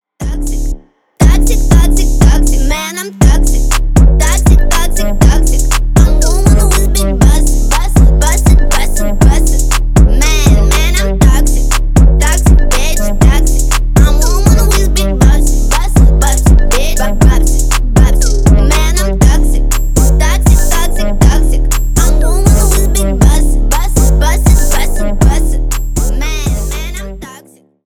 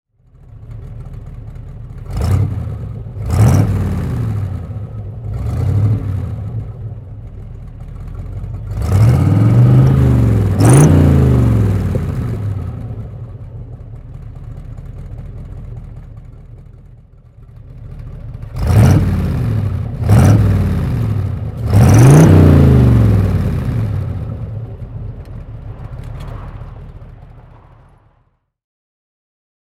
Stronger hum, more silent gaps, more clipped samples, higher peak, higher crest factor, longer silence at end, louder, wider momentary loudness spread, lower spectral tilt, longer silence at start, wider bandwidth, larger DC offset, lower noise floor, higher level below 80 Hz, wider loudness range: neither; neither; neither; about the same, 0 dBFS vs 0 dBFS; second, 8 dB vs 14 dB; second, 0.5 s vs 2.35 s; about the same, -11 LUFS vs -13 LUFS; second, 7 LU vs 23 LU; second, -5 dB/octave vs -8 dB/octave; second, 0.2 s vs 0.55 s; about the same, 16.5 kHz vs 15 kHz; neither; second, -40 dBFS vs -59 dBFS; first, -8 dBFS vs -26 dBFS; second, 2 LU vs 22 LU